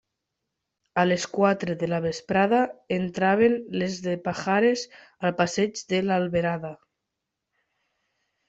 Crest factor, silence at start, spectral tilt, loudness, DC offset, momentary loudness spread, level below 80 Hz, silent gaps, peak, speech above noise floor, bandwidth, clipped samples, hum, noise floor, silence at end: 20 dB; 0.95 s; -5.5 dB/octave; -25 LUFS; under 0.1%; 8 LU; -62 dBFS; none; -6 dBFS; 59 dB; 8 kHz; under 0.1%; none; -83 dBFS; 1.75 s